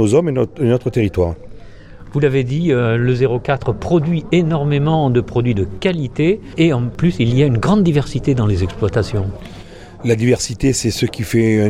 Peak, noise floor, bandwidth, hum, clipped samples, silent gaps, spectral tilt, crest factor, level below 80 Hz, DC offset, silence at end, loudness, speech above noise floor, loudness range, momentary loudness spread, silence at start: 0 dBFS; -35 dBFS; 15 kHz; none; under 0.1%; none; -6.5 dB/octave; 14 dB; -36 dBFS; under 0.1%; 0 s; -16 LUFS; 20 dB; 2 LU; 6 LU; 0 s